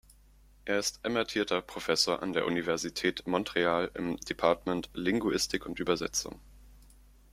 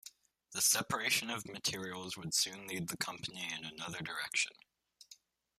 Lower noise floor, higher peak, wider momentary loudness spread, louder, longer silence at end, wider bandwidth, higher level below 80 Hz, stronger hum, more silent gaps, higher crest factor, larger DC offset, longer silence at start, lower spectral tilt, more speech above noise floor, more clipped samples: second, -59 dBFS vs -63 dBFS; first, -10 dBFS vs -18 dBFS; second, 6 LU vs 12 LU; first, -31 LUFS vs -36 LUFS; about the same, 0.55 s vs 0.45 s; about the same, 16 kHz vs 15 kHz; first, -56 dBFS vs -74 dBFS; neither; neither; about the same, 22 dB vs 22 dB; neither; first, 0.65 s vs 0.05 s; first, -3.5 dB/octave vs -1 dB/octave; about the same, 28 dB vs 25 dB; neither